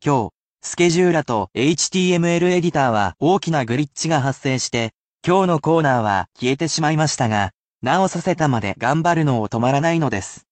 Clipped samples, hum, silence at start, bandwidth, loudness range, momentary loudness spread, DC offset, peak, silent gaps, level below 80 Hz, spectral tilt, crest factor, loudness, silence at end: under 0.1%; none; 0.05 s; 9 kHz; 2 LU; 6 LU; under 0.1%; -4 dBFS; 0.34-0.53 s, 4.94-5.15 s, 7.54-7.79 s; -52 dBFS; -5 dB/octave; 14 dB; -19 LUFS; 0.15 s